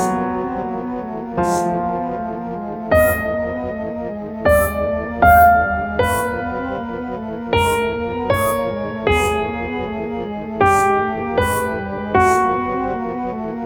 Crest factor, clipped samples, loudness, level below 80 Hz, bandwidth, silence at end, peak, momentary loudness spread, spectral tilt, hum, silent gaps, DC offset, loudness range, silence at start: 18 dB; under 0.1%; -19 LUFS; -34 dBFS; over 20 kHz; 0 s; 0 dBFS; 11 LU; -5.5 dB/octave; none; none; under 0.1%; 4 LU; 0 s